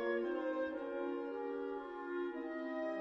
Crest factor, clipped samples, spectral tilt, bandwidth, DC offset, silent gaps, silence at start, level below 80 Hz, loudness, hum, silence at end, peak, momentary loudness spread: 14 dB; under 0.1%; -6 dB/octave; 6 kHz; under 0.1%; none; 0 s; -76 dBFS; -41 LUFS; none; 0 s; -26 dBFS; 5 LU